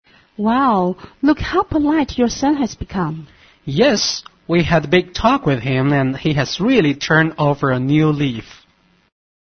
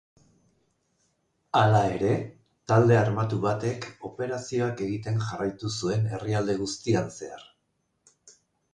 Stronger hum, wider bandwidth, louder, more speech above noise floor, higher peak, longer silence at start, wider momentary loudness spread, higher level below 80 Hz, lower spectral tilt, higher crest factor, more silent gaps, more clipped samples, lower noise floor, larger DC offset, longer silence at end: neither; second, 6.6 kHz vs 9.8 kHz; first, -17 LUFS vs -26 LUFS; second, 40 dB vs 50 dB; first, -2 dBFS vs -8 dBFS; second, 0.4 s vs 1.55 s; second, 8 LU vs 15 LU; first, -40 dBFS vs -58 dBFS; about the same, -5.5 dB/octave vs -6.5 dB/octave; about the same, 16 dB vs 20 dB; neither; neither; second, -56 dBFS vs -75 dBFS; neither; second, 1 s vs 1.3 s